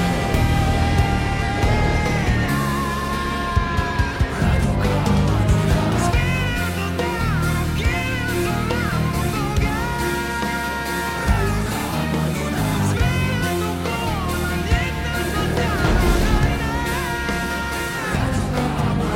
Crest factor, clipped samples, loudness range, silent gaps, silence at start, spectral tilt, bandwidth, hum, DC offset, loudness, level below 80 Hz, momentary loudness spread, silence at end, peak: 14 dB; under 0.1%; 2 LU; none; 0 s; -5.5 dB/octave; 16.5 kHz; none; under 0.1%; -21 LUFS; -26 dBFS; 4 LU; 0 s; -4 dBFS